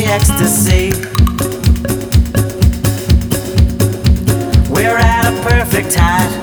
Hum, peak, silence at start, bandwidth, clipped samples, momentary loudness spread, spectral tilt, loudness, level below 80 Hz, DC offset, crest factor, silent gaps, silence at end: none; 0 dBFS; 0 s; over 20 kHz; under 0.1%; 4 LU; -5 dB/octave; -13 LUFS; -16 dBFS; under 0.1%; 12 dB; none; 0 s